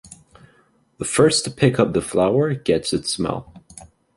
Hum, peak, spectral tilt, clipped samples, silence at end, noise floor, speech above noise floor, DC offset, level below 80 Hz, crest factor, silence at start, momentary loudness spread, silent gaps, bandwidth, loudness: none; -2 dBFS; -4.5 dB/octave; under 0.1%; 0.3 s; -59 dBFS; 40 dB; under 0.1%; -48 dBFS; 18 dB; 0.05 s; 9 LU; none; 11.5 kHz; -19 LUFS